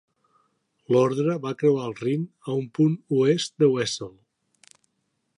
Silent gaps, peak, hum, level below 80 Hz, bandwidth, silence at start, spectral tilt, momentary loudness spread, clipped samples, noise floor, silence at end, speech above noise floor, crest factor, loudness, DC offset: none; -8 dBFS; none; -70 dBFS; 11 kHz; 0.9 s; -6 dB/octave; 8 LU; under 0.1%; -75 dBFS; 1.3 s; 52 dB; 18 dB; -24 LUFS; under 0.1%